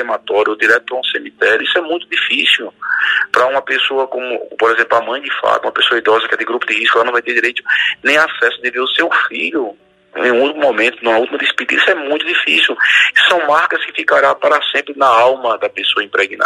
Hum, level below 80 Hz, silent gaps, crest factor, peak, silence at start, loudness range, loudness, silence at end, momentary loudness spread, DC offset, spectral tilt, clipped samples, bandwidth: none; -66 dBFS; none; 14 dB; 0 dBFS; 0 s; 3 LU; -13 LUFS; 0 s; 7 LU; under 0.1%; -2 dB/octave; under 0.1%; 15.5 kHz